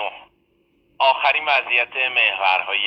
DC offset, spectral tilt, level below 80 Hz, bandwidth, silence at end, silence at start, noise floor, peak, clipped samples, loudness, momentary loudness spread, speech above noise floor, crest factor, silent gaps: under 0.1%; -2 dB/octave; -68 dBFS; 8.2 kHz; 0 s; 0 s; -63 dBFS; -2 dBFS; under 0.1%; -17 LUFS; 3 LU; 43 dB; 18 dB; none